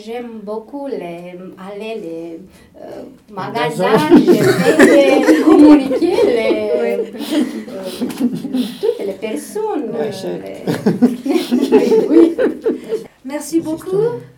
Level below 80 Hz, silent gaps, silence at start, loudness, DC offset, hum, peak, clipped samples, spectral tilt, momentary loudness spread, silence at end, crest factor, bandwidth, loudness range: -52 dBFS; none; 0 s; -14 LUFS; under 0.1%; none; 0 dBFS; 0.2%; -6 dB/octave; 19 LU; 0.1 s; 14 dB; 17.5 kHz; 11 LU